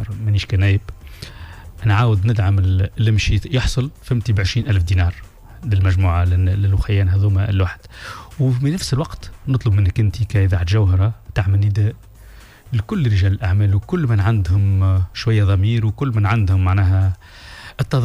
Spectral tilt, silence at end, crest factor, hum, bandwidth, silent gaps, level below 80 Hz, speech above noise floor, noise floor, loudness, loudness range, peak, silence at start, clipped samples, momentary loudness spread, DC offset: -7 dB/octave; 0 s; 12 dB; none; 11 kHz; none; -32 dBFS; 25 dB; -41 dBFS; -18 LUFS; 2 LU; -6 dBFS; 0 s; under 0.1%; 15 LU; under 0.1%